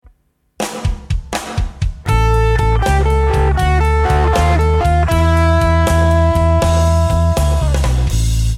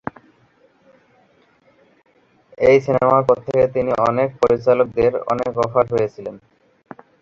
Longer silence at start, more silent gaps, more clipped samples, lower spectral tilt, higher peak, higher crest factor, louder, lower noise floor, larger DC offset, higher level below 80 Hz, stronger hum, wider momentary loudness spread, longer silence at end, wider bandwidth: second, 0.6 s vs 2.6 s; neither; neither; second, -6 dB/octave vs -7.5 dB/octave; about the same, 0 dBFS vs -2 dBFS; second, 12 dB vs 18 dB; about the same, -15 LUFS vs -17 LUFS; about the same, -56 dBFS vs -56 dBFS; neither; first, -16 dBFS vs -50 dBFS; neither; about the same, 9 LU vs 7 LU; second, 0 s vs 0.85 s; first, 14.5 kHz vs 7.4 kHz